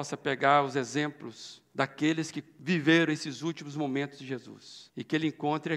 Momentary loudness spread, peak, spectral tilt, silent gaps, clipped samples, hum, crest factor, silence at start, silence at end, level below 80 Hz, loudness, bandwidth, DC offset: 19 LU; -8 dBFS; -5 dB/octave; none; under 0.1%; none; 22 dB; 0 s; 0 s; -78 dBFS; -29 LUFS; 11 kHz; under 0.1%